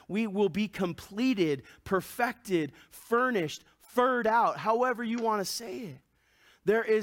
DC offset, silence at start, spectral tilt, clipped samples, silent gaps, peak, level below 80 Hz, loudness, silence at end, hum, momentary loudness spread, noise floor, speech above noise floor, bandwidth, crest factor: under 0.1%; 0.1 s; -5 dB/octave; under 0.1%; none; -14 dBFS; -66 dBFS; -29 LUFS; 0 s; none; 10 LU; -64 dBFS; 35 dB; 17 kHz; 16 dB